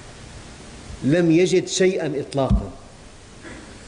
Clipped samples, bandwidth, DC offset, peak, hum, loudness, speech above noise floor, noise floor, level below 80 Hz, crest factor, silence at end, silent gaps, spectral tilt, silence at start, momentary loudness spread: under 0.1%; 10.5 kHz; under 0.1%; -8 dBFS; none; -20 LUFS; 24 dB; -43 dBFS; -34 dBFS; 14 dB; 0 s; none; -5.5 dB/octave; 0 s; 23 LU